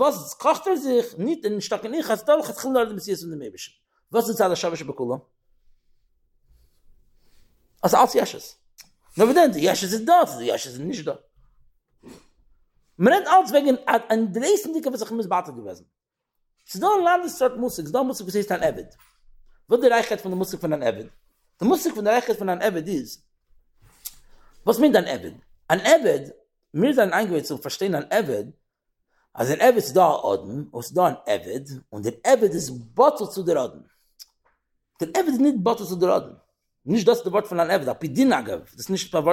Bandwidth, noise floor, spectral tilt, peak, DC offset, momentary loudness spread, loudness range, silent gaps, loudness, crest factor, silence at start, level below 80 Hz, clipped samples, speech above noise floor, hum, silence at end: 17 kHz; -75 dBFS; -4.5 dB/octave; -4 dBFS; under 0.1%; 15 LU; 5 LU; none; -22 LUFS; 20 dB; 0 s; -62 dBFS; under 0.1%; 54 dB; none; 0 s